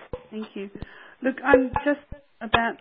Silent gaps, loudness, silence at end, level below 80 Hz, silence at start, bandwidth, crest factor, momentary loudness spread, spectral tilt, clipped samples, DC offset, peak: none; -24 LUFS; 0.05 s; -46 dBFS; 0 s; 4.6 kHz; 24 dB; 19 LU; -9.5 dB/octave; under 0.1%; under 0.1%; -2 dBFS